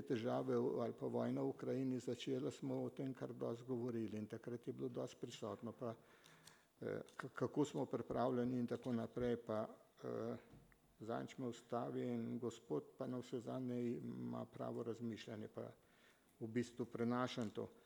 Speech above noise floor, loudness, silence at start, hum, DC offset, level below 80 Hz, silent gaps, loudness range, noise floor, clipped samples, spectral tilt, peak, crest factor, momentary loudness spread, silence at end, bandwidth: 27 dB; -45 LUFS; 0 s; none; under 0.1%; -78 dBFS; none; 5 LU; -72 dBFS; under 0.1%; -7 dB/octave; -26 dBFS; 20 dB; 9 LU; 0.05 s; 20 kHz